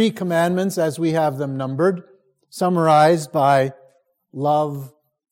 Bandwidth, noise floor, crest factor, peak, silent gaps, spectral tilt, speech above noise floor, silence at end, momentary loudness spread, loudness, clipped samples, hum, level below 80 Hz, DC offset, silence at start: 17 kHz; -57 dBFS; 16 dB; -4 dBFS; none; -6 dB/octave; 39 dB; 0.45 s; 12 LU; -19 LUFS; under 0.1%; none; -66 dBFS; under 0.1%; 0 s